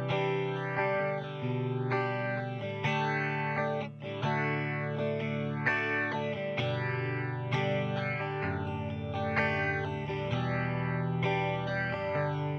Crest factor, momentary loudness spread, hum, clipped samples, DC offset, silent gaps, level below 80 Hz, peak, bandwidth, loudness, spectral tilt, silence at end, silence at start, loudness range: 18 dB; 5 LU; none; under 0.1%; under 0.1%; none; -62 dBFS; -14 dBFS; 6.6 kHz; -32 LUFS; -7.5 dB/octave; 0 s; 0 s; 1 LU